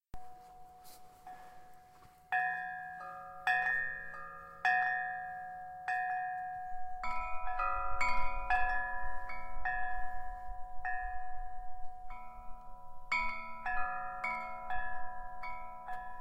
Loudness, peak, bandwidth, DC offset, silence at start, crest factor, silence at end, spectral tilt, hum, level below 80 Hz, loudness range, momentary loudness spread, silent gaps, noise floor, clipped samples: -37 LUFS; -18 dBFS; 8.4 kHz; under 0.1%; 0.15 s; 18 dB; 0 s; -3.5 dB/octave; none; -48 dBFS; 7 LU; 21 LU; none; -60 dBFS; under 0.1%